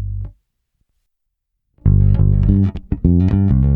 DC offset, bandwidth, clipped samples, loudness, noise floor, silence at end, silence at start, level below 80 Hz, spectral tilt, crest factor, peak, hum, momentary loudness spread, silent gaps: under 0.1%; 3.1 kHz; under 0.1%; -15 LUFS; -74 dBFS; 0 s; 0 s; -22 dBFS; -12 dB/octave; 16 dB; 0 dBFS; none; 13 LU; none